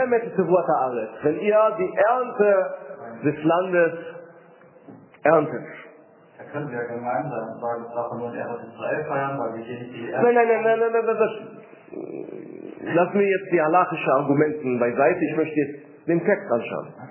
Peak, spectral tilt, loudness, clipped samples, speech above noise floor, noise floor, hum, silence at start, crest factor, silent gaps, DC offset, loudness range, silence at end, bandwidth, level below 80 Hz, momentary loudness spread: -4 dBFS; -10.5 dB/octave; -22 LUFS; under 0.1%; 28 dB; -50 dBFS; none; 0 s; 18 dB; none; under 0.1%; 7 LU; 0 s; 3.2 kHz; -72 dBFS; 16 LU